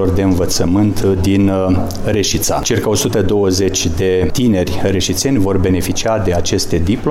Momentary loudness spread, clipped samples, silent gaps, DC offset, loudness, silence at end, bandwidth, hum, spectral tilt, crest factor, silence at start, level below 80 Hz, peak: 3 LU; under 0.1%; none; under 0.1%; -14 LUFS; 0 s; 16.5 kHz; none; -5 dB/octave; 10 dB; 0 s; -28 dBFS; -4 dBFS